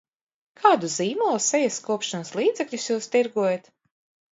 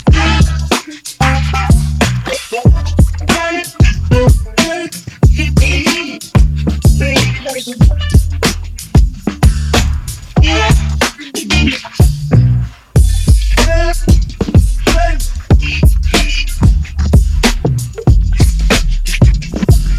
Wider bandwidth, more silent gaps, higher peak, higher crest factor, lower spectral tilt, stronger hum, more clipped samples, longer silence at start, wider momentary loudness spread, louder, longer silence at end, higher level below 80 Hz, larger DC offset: second, 8 kHz vs 15.5 kHz; neither; second, -4 dBFS vs 0 dBFS; first, 22 dB vs 10 dB; second, -3 dB/octave vs -5 dB/octave; neither; second, under 0.1% vs 0.5%; first, 0.6 s vs 0.05 s; about the same, 7 LU vs 6 LU; second, -24 LUFS vs -13 LUFS; first, 0.75 s vs 0 s; second, -78 dBFS vs -14 dBFS; neither